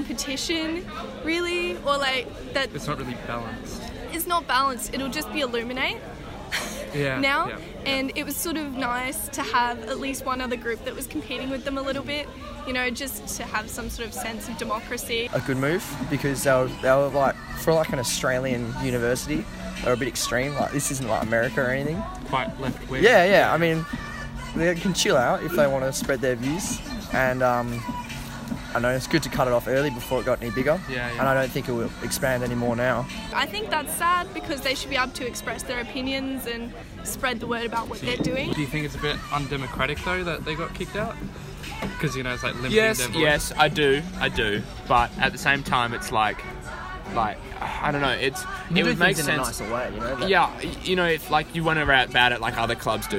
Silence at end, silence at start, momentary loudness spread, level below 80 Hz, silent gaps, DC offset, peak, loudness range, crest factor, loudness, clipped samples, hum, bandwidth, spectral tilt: 0 s; 0 s; 11 LU; -42 dBFS; none; under 0.1%; -4 dBFS; 6 LU; 22 dB; -25 LUFS; under 0.1%; none; 16 kHz; -4 dB/octave